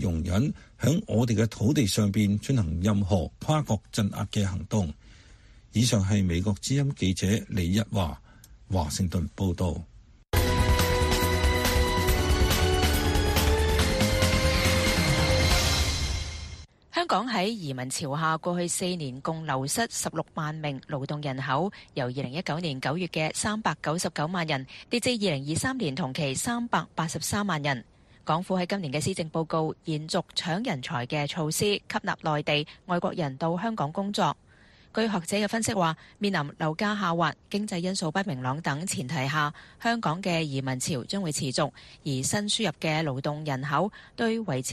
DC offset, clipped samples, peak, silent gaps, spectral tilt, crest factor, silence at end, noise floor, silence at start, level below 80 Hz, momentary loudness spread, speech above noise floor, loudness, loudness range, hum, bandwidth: under 0.1%; under 0.1%; -10 dBFS; none; -4.5 dB/octave; 18 dB; 0 s; -56 dBFS; 0 s; -38 dBFS; 8 LU; 28 dB; -27 LUFS; 5 LU; none; 13.5 kHz